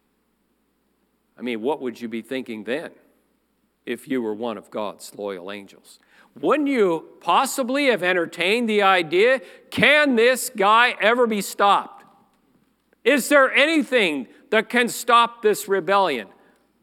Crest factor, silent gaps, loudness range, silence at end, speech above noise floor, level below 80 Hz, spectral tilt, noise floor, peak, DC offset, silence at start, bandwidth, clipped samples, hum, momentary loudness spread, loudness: 22 dB; none; 13 LU; 0.55 s; 47 dB; -76 dBFS; -3 dB/octave; -68 dBFS; 0 dBFS; under 0.1%; 1.4 s; 17.5 kHz; under 0.1%; none; 16 LU; -20 LUFS